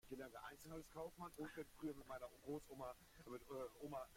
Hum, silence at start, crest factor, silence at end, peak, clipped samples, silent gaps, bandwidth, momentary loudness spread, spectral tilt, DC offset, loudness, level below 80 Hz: none; 0.05 s; 16 dB; 0 s; -38 dBFS; under 0.1%; none; 16.5 kHz; 5 LU; -5.5 dB/octave; under 0.1%; -55 LUFS; -72 dBFS